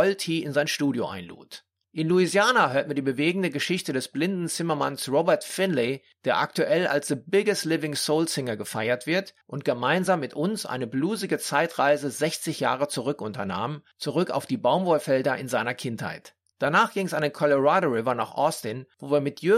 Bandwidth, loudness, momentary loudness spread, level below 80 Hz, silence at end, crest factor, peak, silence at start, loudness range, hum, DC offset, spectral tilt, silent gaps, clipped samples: 16 kHz; -25 LUFS; 9 LU; -72 dBFS; 0 s; 18 dB; -8 dBFS; 0 s; 2 LU; none; under 0.1%; -4.5 dB/octave; none; under 0.1%